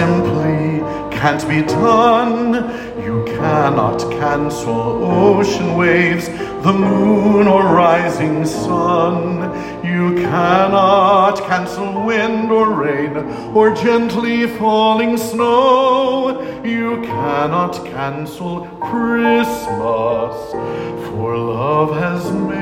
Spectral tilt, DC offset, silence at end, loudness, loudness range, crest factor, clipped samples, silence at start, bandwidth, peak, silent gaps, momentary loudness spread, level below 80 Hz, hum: -6.5 dB/octave; under 0.1%; 0 s; -15 LUFS; 5 LU; 14 dB; under 0.1%; 0 s; 16.5 kHz; 0 dBFS; none; 11 LU; -44 dBFS; none